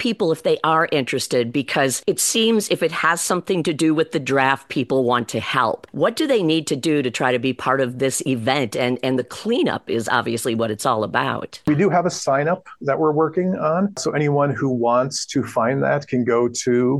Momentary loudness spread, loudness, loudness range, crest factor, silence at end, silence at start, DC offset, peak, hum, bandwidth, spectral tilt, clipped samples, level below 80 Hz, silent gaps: 4 LU; -20 LUFS; 2 LU; 18 dB; 0 s; 0 s; under 0.1%; -2 dBFS; none; 13 kHz; -4.5 dB/octave; under 0.1%; -62 dBFS; none